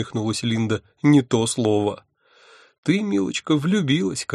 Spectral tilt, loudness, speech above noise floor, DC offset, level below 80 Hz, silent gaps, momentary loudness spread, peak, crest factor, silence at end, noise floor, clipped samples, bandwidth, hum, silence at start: -5.5 dB/octave; -21 LUFS; 32 dB; under 0.1%; -60 dBFS; 2.78-2.83 s; 8 LU; -4 dBFS; 18 dB; 0 s; -53 dBFS; under 0.1%; 12 kHz; none; 0 s